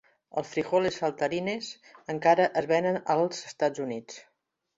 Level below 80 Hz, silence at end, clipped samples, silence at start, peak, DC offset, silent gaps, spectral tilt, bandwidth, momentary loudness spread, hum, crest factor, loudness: -70 dBFS; 0.55 s; under 0.1%; 0.35 s; -8 dBFS; under 0.1%; none; -5 dB/octave; 8 kHz; 15 LU; none; 20 dB; -28 LUFS